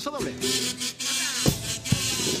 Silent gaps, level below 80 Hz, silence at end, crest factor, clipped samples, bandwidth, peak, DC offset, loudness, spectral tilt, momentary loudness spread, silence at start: none; -48 dBFS; 0 s; 20 dB; under 0.1%; 15.5 kHz; -6 dBFS; under 0.1%; -25 LUFS; -2.5 dB/octave; 5 LU; 0 s